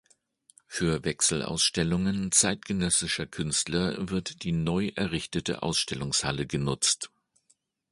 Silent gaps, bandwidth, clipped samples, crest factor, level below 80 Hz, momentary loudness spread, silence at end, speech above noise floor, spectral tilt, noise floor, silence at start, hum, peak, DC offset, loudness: none; 11.5 kHz; under 0.1%; 22 dB; -50 dBFS; 7 LU; 0.85 s; 42 dB; -3 dB/octave; -70 dBFS; 0.7 s; none; -6 dBFS; under 0.1%; -27 LUFS